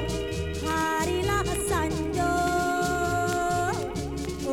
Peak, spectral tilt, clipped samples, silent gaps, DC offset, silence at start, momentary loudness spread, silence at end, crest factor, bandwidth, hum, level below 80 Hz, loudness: -14 dBFS; -4.5 dB/octave; under 0.1%; none; under 0.1%; 0 s; 6 LU; 0 s; 12 dB; 19.5 kHz; none; -38 dBFS; -27 LUFS